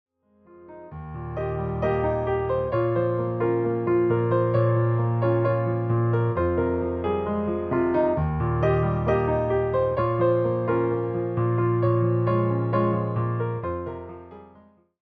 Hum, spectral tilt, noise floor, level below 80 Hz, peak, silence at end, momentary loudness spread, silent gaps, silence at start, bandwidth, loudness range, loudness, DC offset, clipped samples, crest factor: none; -11 dB/octave; -55 dBFS; -46 dBFS; -10 dBFS; 0.6 s; 8 LU; none; 0.55 s; 4.5 kHz; 3 LU; -24 LUFS; under 0.1%; under 0.1%; 14 dB